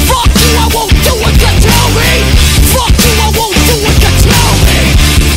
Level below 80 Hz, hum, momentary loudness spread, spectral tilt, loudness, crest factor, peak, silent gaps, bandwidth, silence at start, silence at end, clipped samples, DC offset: -10 dBFS; none; 2 LU; -4 dB/octave; -7 LUFS; 6 dB; 0 dBFS; none; 16.5 kHz; 0 s; 0 s; 0.6%; under 0.1%